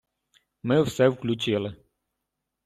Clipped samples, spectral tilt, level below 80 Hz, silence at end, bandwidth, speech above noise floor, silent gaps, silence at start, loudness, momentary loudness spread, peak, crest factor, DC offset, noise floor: under 0.1%; -6 dB/octave; -60 dBFS; 0.9 s; 14.5 kHz; 59 dB; none; 0.65 s; -25 LUFS; 12 LU; -8 dBFS; 18 dB; under 0.1%; -83 dBFS